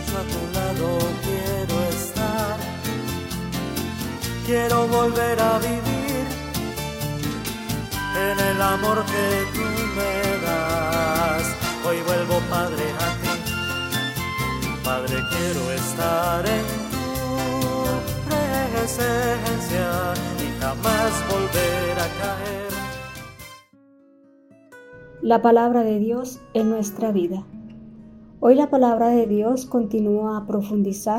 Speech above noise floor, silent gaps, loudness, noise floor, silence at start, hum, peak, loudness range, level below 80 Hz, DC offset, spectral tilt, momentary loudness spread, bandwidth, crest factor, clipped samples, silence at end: 32 dB; none; -23 LUFS; -53 dBFS; 0 s; none; -2 dBFS; 4 LU; -42 dBFS; under 0.1%; -5 dB/octave; 9 LU; 16.5 kHz; 20 dB; under 0.1%; 0 s